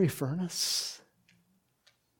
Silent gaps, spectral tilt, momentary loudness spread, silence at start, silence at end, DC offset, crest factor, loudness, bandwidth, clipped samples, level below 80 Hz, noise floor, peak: none; -4 dB/octave; 11 LU; 0 s; 1.2 s; under 0.1%; 20 dB; -31 LUFS; 17.5 kHz; under 0.1%; -76 dBFS; -72 dBFS; -14 dBFS